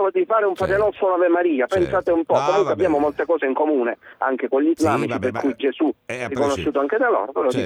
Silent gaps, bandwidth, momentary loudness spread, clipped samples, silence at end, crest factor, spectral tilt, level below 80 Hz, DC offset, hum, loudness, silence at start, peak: none; 13 kHz; 5 LU; under 0.1%; 0 s; 14 dB; -6 dB/octave; -52 dBFS; under 0.1%; none; -20 LUFS; 0 s; -6 dBFS